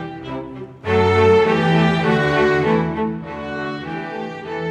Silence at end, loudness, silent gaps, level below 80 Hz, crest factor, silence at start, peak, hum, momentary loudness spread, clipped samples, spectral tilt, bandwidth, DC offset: 0 s; -18 LUFS; none; -46 dBFS; 16 dB; 0 s; -4 dBFS; none; 16 LU; under 0.1%; -7 dB/octave; 9.4 kHz; under 0.1%